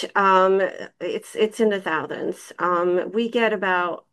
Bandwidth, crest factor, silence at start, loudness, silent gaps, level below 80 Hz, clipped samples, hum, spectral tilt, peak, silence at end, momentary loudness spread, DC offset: 12.5 kHz; 16 dB; 0 s; -22 LUFS; none; -76 dBFS; under 0.1%; none; -5 dB/octave; -6 dBFS; 0.15 s; 12 LU; under 0.1%